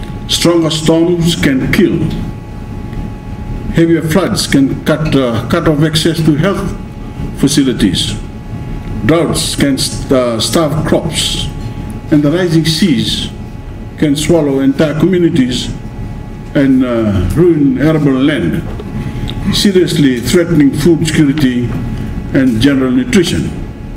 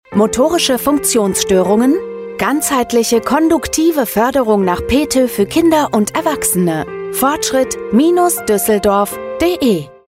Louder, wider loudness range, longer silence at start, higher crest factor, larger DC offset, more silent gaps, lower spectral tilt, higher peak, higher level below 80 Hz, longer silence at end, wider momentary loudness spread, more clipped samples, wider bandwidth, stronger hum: about the same, -12 LUFS vs -14 LUFS; about the same, 3 LU vs 1 LU; about the same, 0 s vs 0.1 s; about the same, 12 dB vs 12 dB; neither; neither; first, -5.5 dB/octave vs -4 dB/octave; about the same, 0 dBFS vs -2 dBFS; first, -26 dBFS vs -40 dBFS; second, 0 s vs 0.2 s; first, 14 LU vs 4 LU; first, 0.5% vs under 0.1%; about the same, 16.5 kHz vs 16.5 kHz; neither